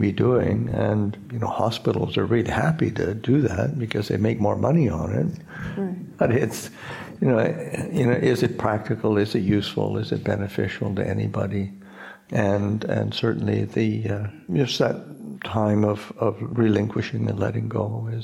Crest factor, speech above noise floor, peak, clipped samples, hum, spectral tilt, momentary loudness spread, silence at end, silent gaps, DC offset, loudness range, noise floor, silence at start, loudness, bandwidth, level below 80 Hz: 18 dB; 20 dB; -4 dBFS; under 0.1%; none; -7 dB/octave; 9 LU; 0 s; none; under 0.1%; 3 LU; -43 dBFS; 0 s; -24 LUFS; 15 kHz; -50 dBFS